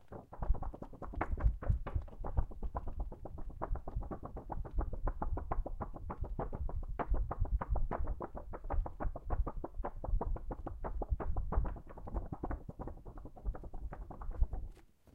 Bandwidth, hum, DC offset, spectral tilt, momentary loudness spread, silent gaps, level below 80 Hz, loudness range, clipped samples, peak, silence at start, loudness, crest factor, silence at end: 3 kHz; none; under 0.1%; -10 dB/octave; 10 LU; none; -38 dBFS; 3 LU; under 0.1%; -18 dBFS; 0 s; -43 LUFS; 20 dB; 0.05 s